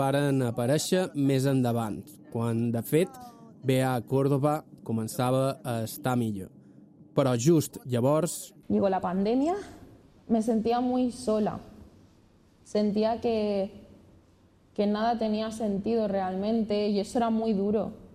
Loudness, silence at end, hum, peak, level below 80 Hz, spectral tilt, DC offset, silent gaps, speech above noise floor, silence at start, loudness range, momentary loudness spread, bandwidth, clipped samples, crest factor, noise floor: -28 LUFS; 0.1 s; none; -12 dBFS; -62 dBFS; -6.5 dB/octave; under 0.1%; none; 33 dB; 0 s; 3 LU; 8 LU; 15.5 kHz; under 0.1%; 16 dB; -60 dBFS